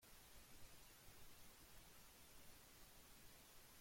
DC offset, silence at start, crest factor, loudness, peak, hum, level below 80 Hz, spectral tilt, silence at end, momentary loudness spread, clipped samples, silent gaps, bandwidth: under 0.1%; 0 s; 14 dB; -65 LUFS; -48 dBFS; none; -72 dBFS; -2 dB/octave; 0 s; 0 LU; under 0.1%; none; 16.5 kHz